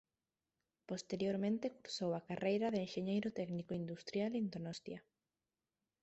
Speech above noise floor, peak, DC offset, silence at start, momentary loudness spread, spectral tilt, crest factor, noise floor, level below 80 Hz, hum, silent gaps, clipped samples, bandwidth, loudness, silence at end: over 50 dB; -24 dBFS; under 0.1%; 0.9 s; 10 LU; -6 dB/octave; 18 dB; under -90 dBFS; -78 dBFS; none; none; under 0.1%; 8 kHz; -41 LUFS; 1.05 s